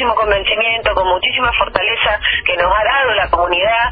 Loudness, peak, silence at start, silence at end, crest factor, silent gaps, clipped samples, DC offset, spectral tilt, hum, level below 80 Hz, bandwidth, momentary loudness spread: -13 LUFS; 0 dBFS; 0 s; 0 s; 14 dB; none; under 0.1%; under 0.1%; -6.5 dB/octave; none; -32 dBFS; 5 kHz; 2 LU